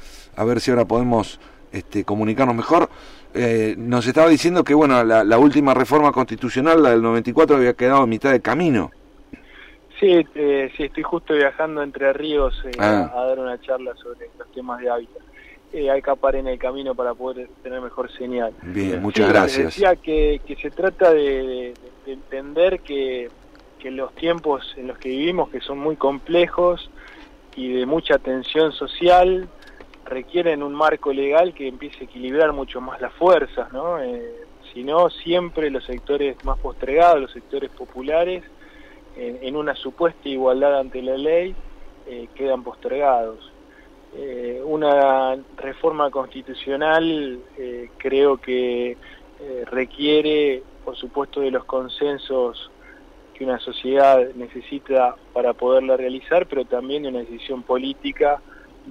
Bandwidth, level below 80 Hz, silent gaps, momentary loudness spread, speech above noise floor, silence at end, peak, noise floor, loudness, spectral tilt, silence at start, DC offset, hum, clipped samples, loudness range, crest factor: 13 kHz; -40 dBFS; none; 17 LU; 28 dB; 0 s; -6 dBFS; -47 dBFS; -20 LUFS; -6 dB/octave; 0 s; under 0.1%; none; under 0.1%; 8 LU; 16 dB